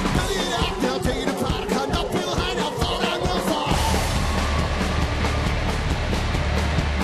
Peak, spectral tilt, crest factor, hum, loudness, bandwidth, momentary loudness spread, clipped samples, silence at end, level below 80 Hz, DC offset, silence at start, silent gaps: -6 dBFS; -5 dB/octave; 16 dB; none; -23 LUFS; 13.5 kHz; 2 LU; under 0.1%; 0 s; -28 dBFS; under 0.1%; 0 s; none